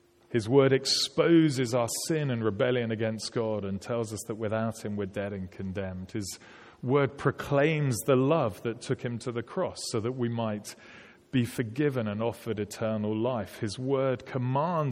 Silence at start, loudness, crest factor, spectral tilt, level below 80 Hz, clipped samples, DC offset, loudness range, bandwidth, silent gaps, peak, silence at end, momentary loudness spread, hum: 0.3 s; -29 LUFS; 20 dB; -5.5 dB/octave; -64 dBFS; under 0.1%; under 0.1%; 6 LU; 16.5 kHz; none; -8 dBFS; 0 s; 12 LU; none